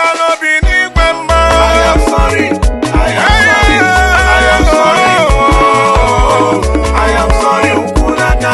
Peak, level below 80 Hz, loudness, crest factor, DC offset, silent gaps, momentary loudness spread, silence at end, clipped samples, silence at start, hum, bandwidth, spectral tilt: 0 dBFS; -14 dBFS; -9 LUFS; 8 dB; under 0.1%; none; 4 LU; 0 s; 0.1%; 0 s; none; 12.5 kHz; -4.5 dB/octave